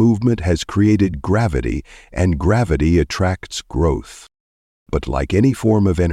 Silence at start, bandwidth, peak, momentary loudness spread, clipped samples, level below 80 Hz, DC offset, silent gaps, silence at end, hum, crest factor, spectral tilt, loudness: 0 s; 13.5 kHz; -2 dBFS; 10 LU; under 0.1%; -28 dBFS; under 0.1%; 4.40-4.86 s; 0 s; none; 14 dB; -7 dB/octave; -18 LUFS